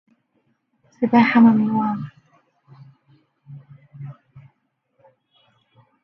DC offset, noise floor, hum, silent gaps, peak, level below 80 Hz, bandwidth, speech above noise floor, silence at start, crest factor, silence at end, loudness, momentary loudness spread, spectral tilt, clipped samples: under 0.1%; -70 dBFS; none; none; -2 dBFS; -68 dBFS; 5.8 kHz; 54 dB; 1 s; 20 dB; 1.9 s; -17 LUFS; 25 LU; -8.5 dB/octave; under 0.1%